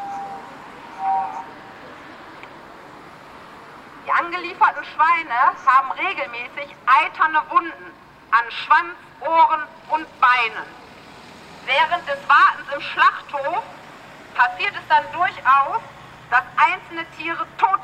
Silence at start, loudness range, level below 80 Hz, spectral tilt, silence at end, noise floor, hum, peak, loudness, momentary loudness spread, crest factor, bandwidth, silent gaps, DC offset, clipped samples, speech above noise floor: 0 s; 10 LU; -64 dBFS; -3 dB/octave; 0 s; -42 dBFS; none; -2 dBFS; -19 LUFS; 23 LU; 20 dB; 9.8 kHz; none; under 0.1%; under 0.1%; 23 dB